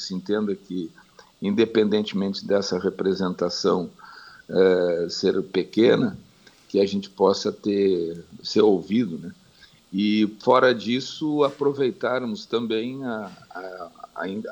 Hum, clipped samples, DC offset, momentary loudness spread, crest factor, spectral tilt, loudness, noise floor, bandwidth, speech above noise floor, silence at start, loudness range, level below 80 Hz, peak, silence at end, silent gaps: none; under 0.1%; under 0.1%; 15 LU; 18 dB; -5.5 dB/octave; -23 LUFS; -54 dBFS; 19 kHz; 31 dB; 0 s; 2 LU; -66 dBFS; -6 dBFS; 0 s; none